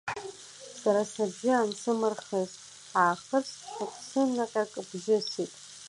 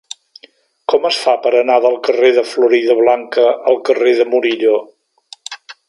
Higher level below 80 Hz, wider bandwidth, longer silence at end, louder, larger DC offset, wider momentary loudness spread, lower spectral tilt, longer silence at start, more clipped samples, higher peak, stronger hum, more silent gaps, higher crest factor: second, -78 dBFS vs -72 dBFS; about the same, 11.5 kHz vs 11.5 kHz; second, 0 s vs 0.15 s; second, -30 LUFS vs -13 LUFS; neither; second, 12 LU vs 18 LU; first, -4 dB/octave vs -2.5 dB/octave; second, 0.05 s vs 0.9 s; neither; second, -12 dBFS vs 0 dBFS; neither; neither; about the same, 18 dB vs 14 dB